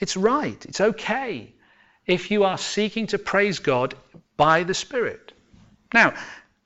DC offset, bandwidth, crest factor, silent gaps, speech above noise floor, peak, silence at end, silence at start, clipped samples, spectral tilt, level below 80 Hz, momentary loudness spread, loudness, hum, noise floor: under 0.1%; 8.2 kHz; 18 dB; none; 36 dB; -6 dBFS; 0.25 s; 0 s; under 0.1%; -4 dB/octave; -56 dBFS; 17 LU; -22 LUFS; none; -58 dBFS